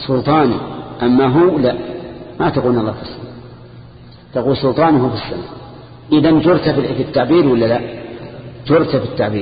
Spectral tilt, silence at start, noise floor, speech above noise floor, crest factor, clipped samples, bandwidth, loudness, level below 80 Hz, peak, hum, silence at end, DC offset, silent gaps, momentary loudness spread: -12.5 dB/octave; 0 s; -38 dBFS; 25 dB; 14 dB; under 0.1%; 5 kHz; -15 LUFS; -42 dBFS; 0 dBFS; none; 0 s; under 0.1%; none; 19 LU